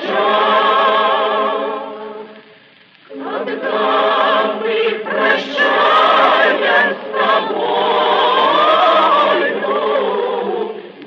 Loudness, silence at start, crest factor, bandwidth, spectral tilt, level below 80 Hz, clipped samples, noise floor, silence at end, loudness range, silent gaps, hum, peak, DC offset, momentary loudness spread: -14 LUFS; 0 s; 14 dB; 7.2 kHz; -4.5 dB/octave; -74 dBFS; under 0.1%; -46 dBFS; 0 s; 6 LU; none; none; 0 dBFS; under 0.1%; 12 LU